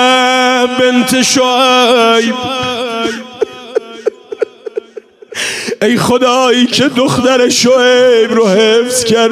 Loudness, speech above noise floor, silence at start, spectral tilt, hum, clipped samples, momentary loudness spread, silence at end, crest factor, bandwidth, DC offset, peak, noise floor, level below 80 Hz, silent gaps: -10 LUFS; 24 dB; 0 s; -3 dB/octave; none; under 0.1%; 13 LU; 0 s; 10 dB; 16 kHz; under 0.1%; 0 dBFS; -33 dBFS; -48 dBFS; none